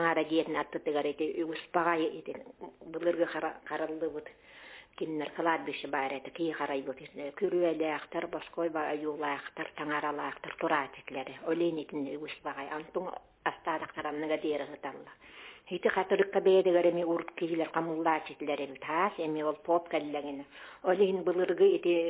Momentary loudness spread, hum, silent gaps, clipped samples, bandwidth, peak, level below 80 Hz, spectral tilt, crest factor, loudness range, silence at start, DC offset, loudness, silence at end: 15 LU; none; none; under 0.1%; 4 kHz; -12 dBFS; -74 dBFS; -3.5 dB/octave; 20 dB; 7 LU; 0 s; under 0.1%; -32 LUFS; 0 s